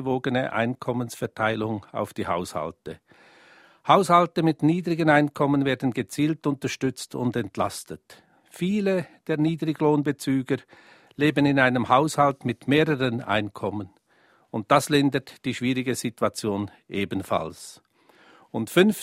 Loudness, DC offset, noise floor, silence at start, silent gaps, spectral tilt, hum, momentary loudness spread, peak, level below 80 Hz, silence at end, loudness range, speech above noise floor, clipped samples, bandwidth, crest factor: -24 LUFS; under 0.1%; -61 dBFS; 0 s; none; -5.5 dB/octave; none; 13 LU; -4 dBFS; -62 dBFS; 0 s; 6 LU; 37 dB; under 0.1%; 16 kHz; 22 dB